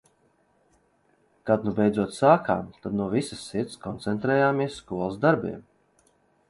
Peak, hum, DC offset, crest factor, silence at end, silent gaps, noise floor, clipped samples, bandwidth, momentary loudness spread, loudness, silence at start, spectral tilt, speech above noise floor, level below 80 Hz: -4 dBFS; none; under 0.1%; 22 dB; 0.9 s; none; -66 dBFS; under 0.1%; 11.5 kHz; 12 LU; -25 LUFS; 1.45 s; -6.5 dB/octave; 41 dB; -58 dBFS